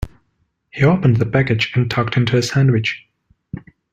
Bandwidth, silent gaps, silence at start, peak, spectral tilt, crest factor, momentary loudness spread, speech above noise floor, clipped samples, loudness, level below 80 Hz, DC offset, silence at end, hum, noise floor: 9.2 kHz; none; 0 s; -2 dBFS; -6.5 dB/octave; 16 dB; 20 LU; 51 dB; under 0.1%; -16 LUFS; -42 dBFS; under 0.1%; 0.35 s; none; -66 dBFS